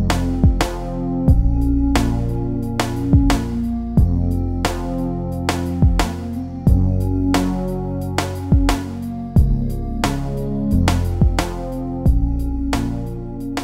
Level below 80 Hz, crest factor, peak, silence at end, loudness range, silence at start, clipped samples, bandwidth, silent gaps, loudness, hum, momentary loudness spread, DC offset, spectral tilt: -22 dBFS; 16 dB; -2 dBFS; 0 s; 2 LU; 0 s; under 0.1%; 16 kHz; none; -20 LUFS; none; 7 LU; under 0.1%; -6.5 dB/octave